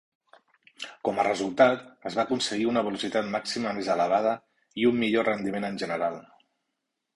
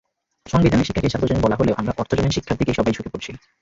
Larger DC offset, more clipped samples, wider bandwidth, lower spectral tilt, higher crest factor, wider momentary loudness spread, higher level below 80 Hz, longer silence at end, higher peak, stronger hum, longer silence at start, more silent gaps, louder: neither; neither; first, 11.5 kHz vs 7.8 kHz; second, -4.5 dB/octave vs -6.5 dB/octave; about the same, 20 dB vs 16 dB; about the same, 11 LU vs 10 LU; second, -66 dBFS vs -36 dBFS; first, 0.95 s vs 0.25 s; about the same, -6 dBFS vs -4 dBFS; neither; first, 0.8 s vs 0.45 s; neither; second, -27 LUFS vs -20 LUFS